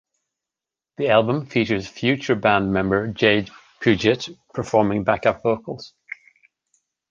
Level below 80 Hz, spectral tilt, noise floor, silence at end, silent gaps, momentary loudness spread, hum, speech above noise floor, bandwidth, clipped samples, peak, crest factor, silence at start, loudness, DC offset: -50 dBFS; -6 dB/octave; -88 dBFS; 1.25 s; none; 17 LU; none; 68 dB; 7.6 kHz; under 0.1%; -2 dBFS; 20 dB; 1 s; -21 LUFS; under 0.1%